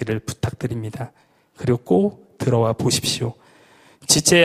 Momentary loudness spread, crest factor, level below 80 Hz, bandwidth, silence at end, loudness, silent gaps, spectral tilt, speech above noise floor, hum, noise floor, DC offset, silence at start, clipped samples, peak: 13 LU; 20 dB; -50 dBFS; 15.5 kHz; 0 s; -21 LUFS; none; -4 dB/octave; 32 dB; none; -52 dBFS; under 0.1%; 0 s; under 0.1%; 0 dBFS